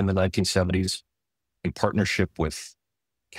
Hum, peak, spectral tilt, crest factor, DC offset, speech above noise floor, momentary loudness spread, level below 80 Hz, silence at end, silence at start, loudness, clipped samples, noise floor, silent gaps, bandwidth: none; -6 dBFS; -5 dB/octave; 20 dB; under 0.1%; 60 dB; 11 LU; -46 dBFS; 0 s; 0 s; -26 LUFS; under 0.1%; -85 dBFS; none; 15.5 kHz